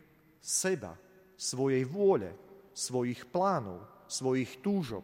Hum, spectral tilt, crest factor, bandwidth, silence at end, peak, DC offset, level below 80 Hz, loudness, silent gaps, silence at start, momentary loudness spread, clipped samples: none; -4.5 dB/octave; 18 dB; 16 kHz; 0 s; -16 dBFS; under 0.1%; -70 dBFS; -32 LUFS; none; 0.45 s; 17 LU; under 0.1%